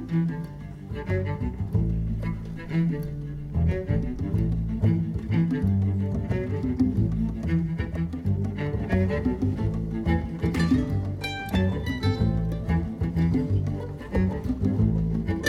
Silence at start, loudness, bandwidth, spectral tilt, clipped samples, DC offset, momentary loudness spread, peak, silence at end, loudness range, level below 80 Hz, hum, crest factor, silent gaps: 0 s; -27 LUFS; 12.5 kHz; -8 dB/octave; under 0.1%; under 0.1%; 6 LU; -10 dBFS; 0 s; 2 LU; -34 dBFS; none; 14 dB; none